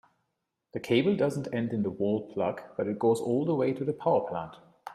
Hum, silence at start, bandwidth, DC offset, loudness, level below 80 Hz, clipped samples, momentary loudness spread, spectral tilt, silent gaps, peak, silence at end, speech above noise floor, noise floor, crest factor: none; 0.75 s; 13.5 kHz; under 0.1%; -29 LUFS; -70 dBFS; under 0.1%; 11 LU; -7 dB/octave; none; -12 dBFS; 0 s; 53 dB; -82 dBFS; 18 dB